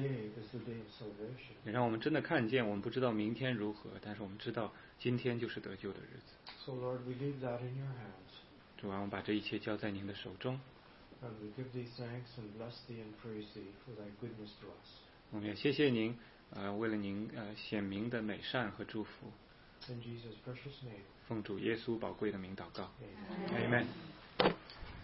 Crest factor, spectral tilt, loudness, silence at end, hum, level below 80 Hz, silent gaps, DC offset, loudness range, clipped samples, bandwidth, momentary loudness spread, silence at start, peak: 32 dB; -4.5 dB/octave; -41 LUFS; 0 s; none; -68 dBFS; none; under 0.1%; 10 LU; under 0.1%; 5.6 kHz; 17 LU; 0 s; -10 dBFS